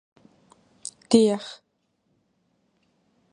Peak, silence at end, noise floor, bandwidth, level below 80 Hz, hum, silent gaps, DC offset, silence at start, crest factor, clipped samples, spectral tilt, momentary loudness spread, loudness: -4 dBFS; 1.8 s; -72 dBFS; 11 kHz; -68 dBFS; none; none; under 0.1%; 1.1 s; 24 dB; under 0.1%; -5 dB/octave; 20 LU; -21 LUFS